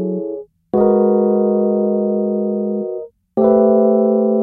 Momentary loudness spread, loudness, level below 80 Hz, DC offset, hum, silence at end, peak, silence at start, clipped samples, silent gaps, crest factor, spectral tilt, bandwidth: 12 LU; -16 LUFS; -56 dBFS; under 0.1%; none; 0 s; 0 dBFS; 0 s; under 0.1%; none; 14 dB; -13.5 dB/octave; 2 kHz